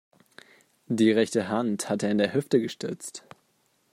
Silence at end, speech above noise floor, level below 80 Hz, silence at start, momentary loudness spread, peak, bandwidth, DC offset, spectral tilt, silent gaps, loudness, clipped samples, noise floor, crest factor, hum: 0.75 s; 44 dB; -72 dBFS; 0.9 s; 14 LU; -8 dBFS; 15.5 kHz; under 0.1%; -5 dB/octave; none; -26 LUFS; under 0.1%; -69 dBFS; 20 dB; none